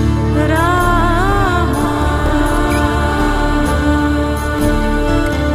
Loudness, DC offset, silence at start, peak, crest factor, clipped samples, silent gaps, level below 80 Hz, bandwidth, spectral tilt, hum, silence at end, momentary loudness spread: -15 LUFS; under 0.1%; 0 s; 0 dBFS; 12 dB; under 0.1%; none; -18 dBFS; 16 kHz; -6 dB/octave; none; 0 s; 3 LU